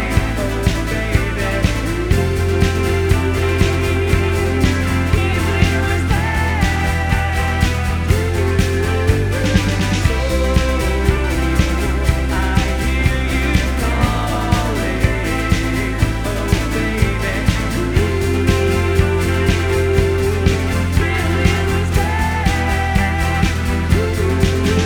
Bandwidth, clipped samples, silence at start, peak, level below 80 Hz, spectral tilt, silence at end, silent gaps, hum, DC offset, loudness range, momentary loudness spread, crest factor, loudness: 19.5 kHz; under 0.1%; 0 s; 0 dBFS; -22 dBFS; -6 dB/octave; 0 s; none; none; under 0.1%; 1 LU; 3 LU; 16 dB; -17 LUFS